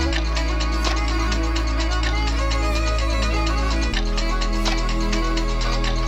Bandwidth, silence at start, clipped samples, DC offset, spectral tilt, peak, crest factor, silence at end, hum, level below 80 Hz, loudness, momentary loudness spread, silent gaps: 9.8 kHz; 0 s; under 0.1%; under 0.1%; -4.5 dB/octave; -8 dBFS; 14 dB; 0 s; none; -22 dBFS; -22 LUFS; 2 LU; none